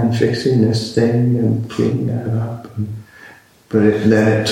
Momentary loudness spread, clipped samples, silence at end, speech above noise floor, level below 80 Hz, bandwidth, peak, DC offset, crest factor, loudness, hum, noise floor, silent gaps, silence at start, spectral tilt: 13 LU; under 0.1%; 0 s; 28 dB; -50 dBFS; 11.5 kHz; -2 dBFS; under 0.1%; 14 dB; -17 LUFS; none; -43 dBFS; none; 0 s; -7 dB/octave